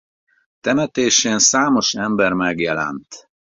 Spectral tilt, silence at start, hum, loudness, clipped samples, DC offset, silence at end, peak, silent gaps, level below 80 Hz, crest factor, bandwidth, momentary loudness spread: -2.5 dB/octave; 0.65 s; none; -17 LUFS; under 0.1%; under 0.1%; 0.4 s; -2 dBFS; none; -56 dBFS; 18 dB; 7.8 kHz; 11 LU